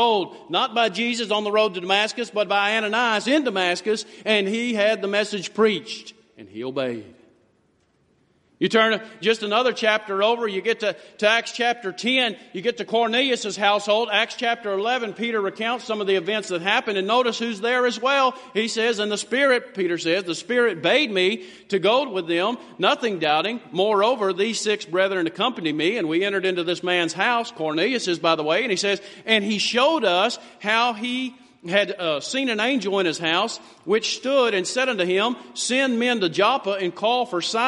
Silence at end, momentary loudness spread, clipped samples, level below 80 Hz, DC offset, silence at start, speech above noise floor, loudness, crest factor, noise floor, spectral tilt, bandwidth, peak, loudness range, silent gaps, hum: 0 s; 6 LU; under 0.1%; -74 dBFS; under 0.1%; 0 s; 42 dB; -22 LUFS; 20 dB; -64 dBFS; -3 dB/octave; 11.5 kHz; -2 dBFS; 2 LU; none; none